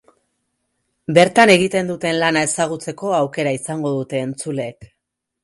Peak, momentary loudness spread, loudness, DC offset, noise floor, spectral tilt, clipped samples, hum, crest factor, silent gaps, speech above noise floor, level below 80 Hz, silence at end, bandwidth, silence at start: 0 dBFS; 14 LU; -17 LUFS; under 0.1%; -77 dBFS; -4.5 dB/octave; under 0.1%; none; 18 dB; none; 60 dB; -60 dBFS; 0.6 s; 11.5 kHz; 1.1 s